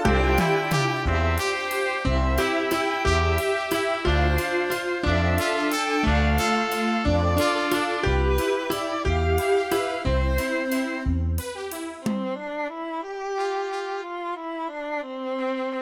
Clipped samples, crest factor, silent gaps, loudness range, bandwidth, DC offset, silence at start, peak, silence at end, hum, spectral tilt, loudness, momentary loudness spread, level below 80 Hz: under 0.1%; 16 dB; none; 7 LU; over 20 kHz; under 0.1%; 0 s; -8 dBFS; 0 s; none; -5.5 dB/octave; -24 LUFS; 9 LU; -32 dBFS